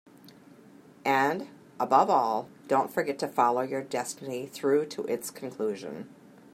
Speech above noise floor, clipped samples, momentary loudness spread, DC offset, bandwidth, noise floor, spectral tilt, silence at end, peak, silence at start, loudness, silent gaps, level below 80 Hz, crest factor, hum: 26 dB; under 0.1%; 13 LU; under 0.1%; 16 kHz; -53 dBFS; -4.5 dB/octave; 0.4 s; -8 dBFS; 0.25 s; -28 LUFS; none; -80 dBFS; 22 dB; none